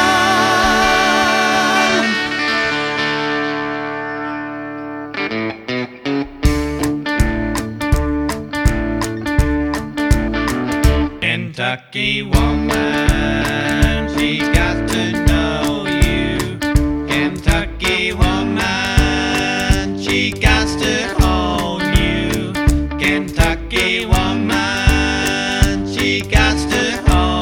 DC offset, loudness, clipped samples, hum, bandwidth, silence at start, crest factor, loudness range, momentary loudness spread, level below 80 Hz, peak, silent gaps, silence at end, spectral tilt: under 0.1%; -16 LUFS; under 0.1%; none; 17.5 kHz; 0 s; 16 dB; 4 LU; 8 LU; -22 dBFS; 0 dBFS; none; 0 s; -4.5 dB/octave